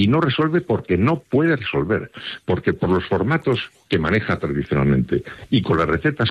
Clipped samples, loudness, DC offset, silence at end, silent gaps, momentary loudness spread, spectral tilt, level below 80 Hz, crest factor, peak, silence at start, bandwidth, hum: under 0.1%; -20 LUFS; under 0.1%; 0 s; none; 6 LU; -8 dB/octave; -44 dBFS; 14 dB; -6 dBFS; 0 s; 9.6 kHz; none